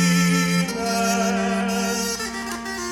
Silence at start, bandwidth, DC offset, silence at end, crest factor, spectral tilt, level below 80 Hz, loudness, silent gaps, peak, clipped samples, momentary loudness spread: 0 s; 17 kHz; under 0.1%; 0 s; 14 dB; -4 dB/octave; -50 dBFS; -22 LUFS; none; -8 dBFS; under 0.1%; 9 LU